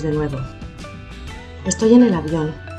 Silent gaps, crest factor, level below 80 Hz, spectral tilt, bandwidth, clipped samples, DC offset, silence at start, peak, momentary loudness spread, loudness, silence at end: none; 18 dB; -38 dBFS; -6 dB/octave; 9.4 kHz; under 0.1%; under 0.1%; 0 s; -2 dBFS; 22 LU; -17 LUFS; 0 s